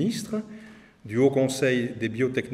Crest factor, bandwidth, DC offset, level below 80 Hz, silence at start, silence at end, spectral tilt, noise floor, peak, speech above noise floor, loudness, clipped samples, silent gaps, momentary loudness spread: 18 dB; 15 kHz; under 0.1%; -64 dBFS; 0 s; 0 s; -5.5 dB/octave; -47 dBFS; -8 dBFS; 22 dB; -25 LUFS; under 0.1%; none; 12 LU